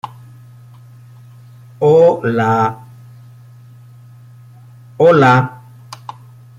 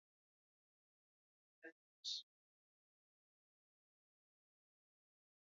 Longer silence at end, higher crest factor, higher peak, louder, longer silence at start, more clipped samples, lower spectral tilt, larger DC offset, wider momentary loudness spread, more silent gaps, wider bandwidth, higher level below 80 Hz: second, 1.05 s vs 3.25 s; second, 16 dB vs 30 dB; first, 0 dBFS vs -32 dBFS; first, -12 LUFS vs -48 LUFS; second, 0.05 s vs 1.65 s; neither; first, -7.5 dB/octave vs 3 dB/octave; neither; first, 24 LU vs 16 LU; second, none vs 1.72-2.04 s; first, 11.5 kHz vs 3.9 kHz; first, -58 dBFS vs under -90 dBFS